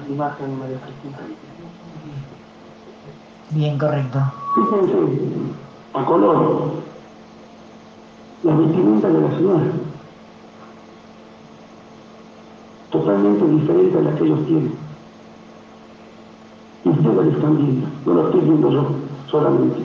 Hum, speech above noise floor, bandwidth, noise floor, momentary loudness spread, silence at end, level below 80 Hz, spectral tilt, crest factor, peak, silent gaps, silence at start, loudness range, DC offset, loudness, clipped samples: none; 25 dB; 6.8 kHz; -42 dBFS; 20 LU; 0 s; -62 dBFS; -10 dB/octave; 16 dB; -4 dBFS; none; 0 s; 9 LU; under 0.1%; -18 LUFS; under 0.1%